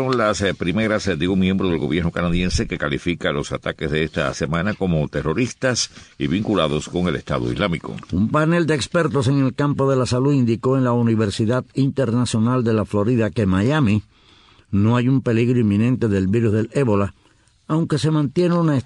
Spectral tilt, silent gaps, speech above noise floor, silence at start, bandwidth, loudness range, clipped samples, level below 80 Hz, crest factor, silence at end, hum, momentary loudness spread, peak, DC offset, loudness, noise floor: -6.5 dB/octave; none; 37 dB; 0 s; 10.5 kHz; 3 LU; under 0.1%; -40 dBFS; 14 dB; 0 s; none; 5 LU; -4 dBFS; under 0.1%; -20 LUFS; -56 dBFS